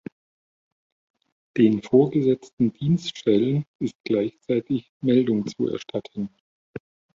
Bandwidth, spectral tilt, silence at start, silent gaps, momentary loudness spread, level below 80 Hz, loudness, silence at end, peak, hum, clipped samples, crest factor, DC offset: 7.6 kHz; -8 dB/octave; 1.55 s; 2.53-2.57 s, 3.67-3.79 s, 3.95-4.04 s, 4.89-5.00 s, 6.40-6.74 s; 15 LU; -62 dBFS; -23 LUFS; 0.4 s; -6 dBFS; none; under 0.1%; 18 dB; under 0.1%